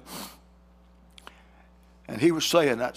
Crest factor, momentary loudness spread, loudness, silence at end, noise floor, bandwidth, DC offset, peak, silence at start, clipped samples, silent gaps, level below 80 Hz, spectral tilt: 22 dB; 18 LU; -23 LUFS; 0.05 s; -56 dBFS; 16 kHz; under 0.1%; -6 dBFS; 0.05 s; under 0.1%; none; -58 dBFS; -4 dB/octave